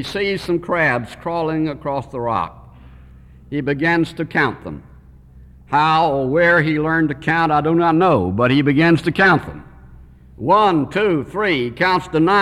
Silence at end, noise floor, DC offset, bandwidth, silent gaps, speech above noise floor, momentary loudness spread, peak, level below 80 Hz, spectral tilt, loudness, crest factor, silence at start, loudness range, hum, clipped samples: 0 s; -44 dBFS; under 0.1%; 12 kHz; none; 27 dB; 10 LU; -4 dBFS; -44 dBFS; -7 dB/octave; -17 LUFS; 14 dB; 0 s; 7 LU; none; under 0.1%